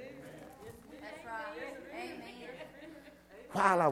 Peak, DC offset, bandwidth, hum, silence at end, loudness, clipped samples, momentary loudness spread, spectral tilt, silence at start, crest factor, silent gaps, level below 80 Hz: -12 dBFS; under 0.1%; 16.5 kHz; none; 0 s; -38 LUFS; under 0.1%; 21 LU; -5 dB/octave; 0 s; 26 dB; none; -70 dBFS